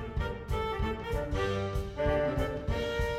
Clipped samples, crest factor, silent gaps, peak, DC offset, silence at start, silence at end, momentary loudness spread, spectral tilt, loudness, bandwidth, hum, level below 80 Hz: under 0.1%; 16 dB; none; -16 dBFS; under 0.1%; 0 s; 0 s; 5 LU; -6.5 dB/octave; -33 LUFS; 16 kHz; none; -38 dBFS